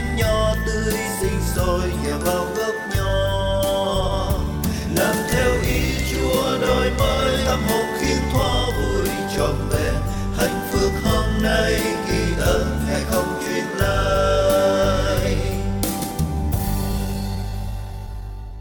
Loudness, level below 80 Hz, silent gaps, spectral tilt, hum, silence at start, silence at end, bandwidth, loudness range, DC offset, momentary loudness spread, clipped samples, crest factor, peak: -21 LUFS; -28 dBFS; none; -5 dB/octave; none; 0 s; 0 s; 19.5 kHz; 2 LU; under 0.1%; 5 LU; under 0.1%; 16 dB; -6 dBFS